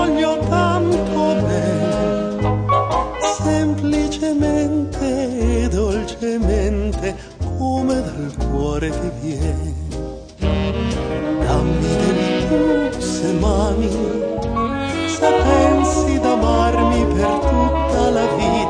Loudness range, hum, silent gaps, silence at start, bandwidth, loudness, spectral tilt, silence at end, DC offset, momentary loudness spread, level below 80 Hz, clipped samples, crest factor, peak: 6 LU; none; none; 0 s; 10 kHz; -18 LUFS; -6 dB/octave; 0 s; under 0.1%; 7 LU; -26 dBFS; under 0.1%; 16 dB; -2 dBFS